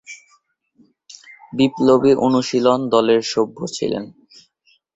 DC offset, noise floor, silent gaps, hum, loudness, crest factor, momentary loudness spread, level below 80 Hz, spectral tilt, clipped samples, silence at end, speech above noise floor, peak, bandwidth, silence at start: under 0.1%; -61 dBFS; none; none; -17 LUFS; 18 dB; 16 LU; -60 dBFS; -5.5 dB/octave; under 0.1%; 0.85 s; 44 dB; -2 dBFS; 8.2 kHz; 0.1 s